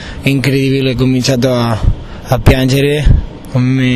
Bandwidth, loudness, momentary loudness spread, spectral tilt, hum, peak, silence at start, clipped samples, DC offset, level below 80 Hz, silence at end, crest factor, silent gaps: 14 kHz; -12 LUFS; 6 LU; -6.5 dB/octave; none; 0 dBFS; 0 s; 0.2%; under 0.1%; -18 dBFS; 0 s; 12 dB; none